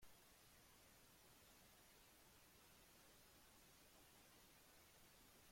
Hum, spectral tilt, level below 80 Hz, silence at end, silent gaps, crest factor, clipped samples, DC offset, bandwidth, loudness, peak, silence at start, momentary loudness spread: none; -2 dB/octave; -82 dBFS; 0 s; none; 16 dB; under 0.1%; under 0.1%; 16.5 kHz; -68 LUFS; -54 dBFS; 0 s; 1 LU